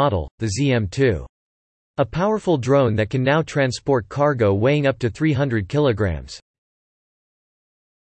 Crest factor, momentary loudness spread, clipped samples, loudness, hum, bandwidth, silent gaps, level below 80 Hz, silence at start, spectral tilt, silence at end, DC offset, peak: 16 dB; 7 LU; under 0.1%; -20 LUFS; none; 8.8 kHz; 0.31-0.38 s, 1.29-1.94 s; -44 dBFS; 0 s; -6.5 dB/octave; 1.65 s; under 0.1%; -6 dBFS